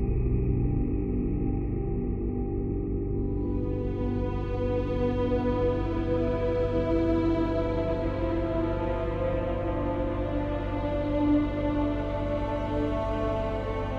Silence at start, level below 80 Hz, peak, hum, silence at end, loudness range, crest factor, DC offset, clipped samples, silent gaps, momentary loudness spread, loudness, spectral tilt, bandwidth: 0 s; -34 dBFS; -14 dBFS; 50 Hz at -50 dBFS; 0 s; 3 LU; 12 dB; under 0.1%; under 0.1%; none; 5 LU; -29 LUFS; -9.5 dB/octave; 6.4 kHz